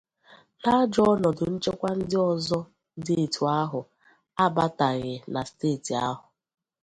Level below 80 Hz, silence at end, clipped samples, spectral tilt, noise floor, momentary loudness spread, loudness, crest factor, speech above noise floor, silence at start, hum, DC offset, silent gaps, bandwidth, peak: -58 dBFS; 0.65 s; under 0.1%; -6 dB/octave; -56 dBFS; 11 LU; -26 LUFS; 18 dB; 32 dB; 0.3 s; none; under 0.1%; none; 11.5 kHz; -8 dBFS